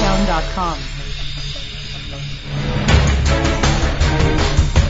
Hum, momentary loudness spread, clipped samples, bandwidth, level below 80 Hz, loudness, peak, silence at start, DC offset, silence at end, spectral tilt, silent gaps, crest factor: none; 12 LU; under 0.1%; 7.8 kHz; -20 dBFS; -19 LUFS; 0 dBFS; 0 s; under 0.1%; 0 s; -5 dB/octave; none; 16 dB